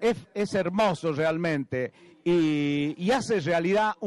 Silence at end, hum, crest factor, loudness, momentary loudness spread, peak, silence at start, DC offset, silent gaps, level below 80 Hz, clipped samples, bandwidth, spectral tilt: 0 s; none; 10 dB; -26 LUFS; 7 LU; -16 dBFS; 0 s; under 0.1%; none; -60 dBFS; under 0.1%; 12 kHz; -6 dB/octave